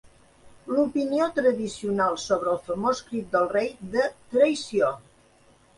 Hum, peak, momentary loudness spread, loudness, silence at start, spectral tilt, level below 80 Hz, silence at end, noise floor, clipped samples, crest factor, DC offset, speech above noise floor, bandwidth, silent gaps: none; -8 dBFS; 6 LU; -25 LUFS; 0.05 s; -5 dB/octave; -60 dBFS; 0.8 s; -58 dBFS; under 0.1%; 18 dB; under 0.1%; 33 dB; 11.5 kHz; none